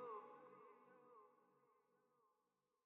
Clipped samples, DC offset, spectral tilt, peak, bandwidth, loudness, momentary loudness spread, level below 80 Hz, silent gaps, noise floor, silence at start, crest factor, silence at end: under 0.1%; under 0.1%; 0 dB/octave; -44 dBFS; 3.8 kHz; -62 LUFS; 13 LU; under -90 dBFS; none; -89 dBFS; 0 s; 18 dB; 0.5 s